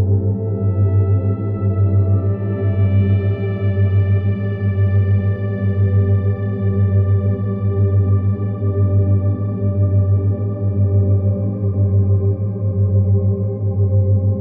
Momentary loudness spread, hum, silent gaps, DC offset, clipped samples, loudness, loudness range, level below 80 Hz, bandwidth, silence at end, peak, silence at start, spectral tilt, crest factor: 5 LU; none; none; under 0.1%; under 0.1%; -17 LUFS; 0 LU; -46 dBFS; 3.1 kHz; 0 s; -6 dBFS; 0 s; -13 dB/octave; 10 dB